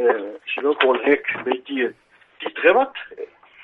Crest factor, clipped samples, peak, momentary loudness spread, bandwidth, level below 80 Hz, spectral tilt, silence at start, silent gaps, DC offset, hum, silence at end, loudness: 22 dB; under 0.1%; 0 dBFS; 17 LU; 4.2 kHz; -68 dBFS; -6 dB/octave; 0 s; none; under 0.1%; none; 0.4 s; -20 LUFS